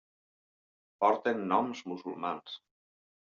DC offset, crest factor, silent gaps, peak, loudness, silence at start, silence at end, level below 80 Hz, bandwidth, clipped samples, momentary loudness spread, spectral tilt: under 0.1%; 22 dB; none; -12 dBFS; -32 LUFS; 1 s; 0.8 s; -82 dBFS; 7.4 kHz; under 0.1%; 14 LU; -3.5 dB/octave